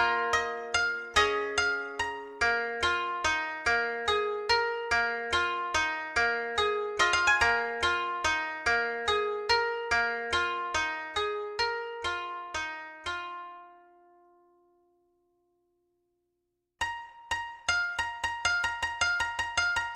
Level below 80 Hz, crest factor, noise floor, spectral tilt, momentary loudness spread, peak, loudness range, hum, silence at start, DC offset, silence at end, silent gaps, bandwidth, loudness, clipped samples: -54 dBFS; 20 dB; -81 dBFS; -1.5 dB/octave; 9 LU; -10 dBFS; 13 LU; 60 Hz at -75 dBFS; 0 s; under 0.1%; 0 s; none; 13.5 kHz; -29 LUFS; under 0.1%